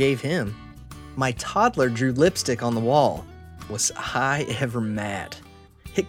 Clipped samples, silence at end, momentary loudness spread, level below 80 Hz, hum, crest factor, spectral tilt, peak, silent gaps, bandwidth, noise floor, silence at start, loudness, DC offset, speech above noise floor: under 0.1%; 0 s; 19 LU; -48 dBFS; none; 18 dB; -4.5 dB/octave; -6 dBFS; none; 17 kHz; -45 dBFS; 0 s; -24 LUFS; under 0.1%; 21 dB